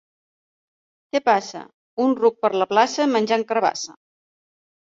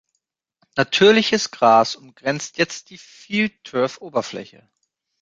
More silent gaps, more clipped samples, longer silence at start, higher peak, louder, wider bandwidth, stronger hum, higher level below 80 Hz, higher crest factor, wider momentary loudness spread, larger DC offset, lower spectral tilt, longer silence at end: first, 1.74-1.97 s vs none; neither; first, 1.15 s vs 0.75 s; about the same, -2 dBFS vs -2 dBFS; about the same, -20 LUFS vs -19 LUFS; second, 7.8 kHz vs 9 kHz; neither; second, -72 dBFS vs -64 dBFS; about the same, 20 dB vs 18 dB; about the same, 16 LU vs 14 LU; neither; about the same, -3.5 dB/octave vs -3.5 dB/octave; first, 1 s vs 0.75 s